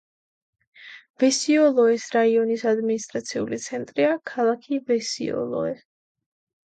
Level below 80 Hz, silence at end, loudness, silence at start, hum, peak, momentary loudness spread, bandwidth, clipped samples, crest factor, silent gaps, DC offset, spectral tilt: -70 dBFS; 0.9 s; -23 LUFS; 0.8 s; none; -8 dBFS; 11 LU; 9.2 kHz; under 0.1%; 16 dB; 1.10-1.14 s; under 0.1%; -3.5 dB/octave